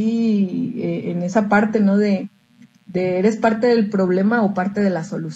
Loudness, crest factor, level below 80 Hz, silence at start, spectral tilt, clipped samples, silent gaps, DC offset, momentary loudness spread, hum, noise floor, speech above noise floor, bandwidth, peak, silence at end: -19 LUFS; 16 dB; -62 dBFS; 0 s; -7.5 dB/octave; under 0.1%; none; under 0.1%; 7 LU; none; -51 dBFS; 33 dB; 8 kHz; -2 dBFS; 0 s